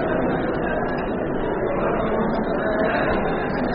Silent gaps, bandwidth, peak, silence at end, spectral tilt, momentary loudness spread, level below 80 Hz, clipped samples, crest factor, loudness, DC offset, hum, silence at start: none; 5.2 kHz; -8 dBFS; 0 s; -5.5 dB/octave; 4 LU; -36 dBFS; under 0.1%; 14 dB; -23 LUFS; under 0.1%; none; 0 s